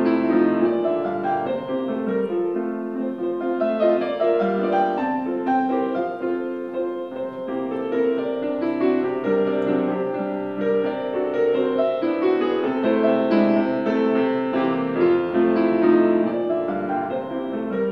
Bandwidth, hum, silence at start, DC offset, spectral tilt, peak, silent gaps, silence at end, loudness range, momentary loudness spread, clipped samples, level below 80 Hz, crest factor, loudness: 5.4 kHz; none; 0 s; under 0.1%; -8.5 dB/octave; -6 dBFS; none; 0 s; 4 LU; 8 LU; under 0.1%; -66 dBFS; 16 dB; -22 LUFS